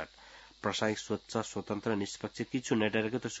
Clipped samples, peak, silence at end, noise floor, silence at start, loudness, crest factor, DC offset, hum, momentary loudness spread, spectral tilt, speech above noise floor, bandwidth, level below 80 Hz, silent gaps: under 0.1%; -14 dBFS; 0 s; -56 dBFS; 0 s; -34 LUFS; 20 dB; under 0.1%; none; 9 LU; -4 dB/octave; 22 dB; 8 kHz; -68 dBFS; none